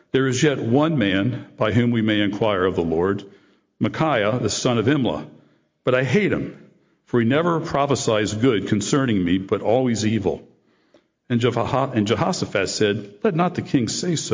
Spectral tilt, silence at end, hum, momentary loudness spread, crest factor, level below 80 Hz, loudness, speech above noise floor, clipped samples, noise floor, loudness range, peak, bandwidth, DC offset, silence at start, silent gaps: -5.5 dB/octave; 0 s; none; 6 LU; 14 dB; -48 dBFS; -21 LUFS; 39 dB; under 0.1%; -59 dBFS; 2 LU; -6 dBFS; 7.8 kHz; under 0.1%; 0.15 s; none